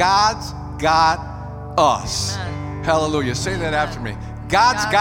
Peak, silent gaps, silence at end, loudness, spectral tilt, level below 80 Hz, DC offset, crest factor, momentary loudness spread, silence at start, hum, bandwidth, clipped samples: -2 dBFS; none; 0 s; -19 LUFS; -4 dB/octave; -38 dBFS; under 0.1%; 16 dB; 13 LU; 0 s; none; 17 kHz; under 0.1%